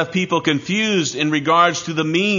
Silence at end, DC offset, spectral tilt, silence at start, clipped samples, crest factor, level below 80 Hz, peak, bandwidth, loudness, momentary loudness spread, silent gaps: 0 s; under 0.1%; -4 dB/octave; 0 s; under 0.1%; 18 dB; -62 dBFS; 0 dBFS; 7.4 kHz; -18 LUFS; 4 LU; none